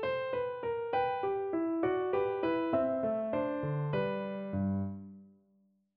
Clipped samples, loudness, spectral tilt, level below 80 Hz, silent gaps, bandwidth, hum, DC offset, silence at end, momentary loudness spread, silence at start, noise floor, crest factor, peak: under 0.1%; -33 LUFS; -10.5 dB/octave; -66 dBFS; none; 5.4 kHz; none; under 0.1%; 0.7 s; 6 LU; 0 s; -71 dBFS; 16 dB; -18 dBFS